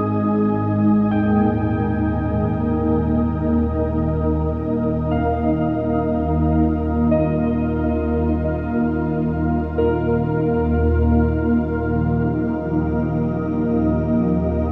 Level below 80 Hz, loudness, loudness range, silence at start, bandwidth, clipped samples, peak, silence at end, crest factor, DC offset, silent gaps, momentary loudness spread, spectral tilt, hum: -28 dBFS; -20 LUFS; 1 LU; 0 s; 4 kHz; under 0.1%; -6 dBFS; 0 s; 12 dB; under 0.1%; none; 4 LU; -11.5 dB/octave; none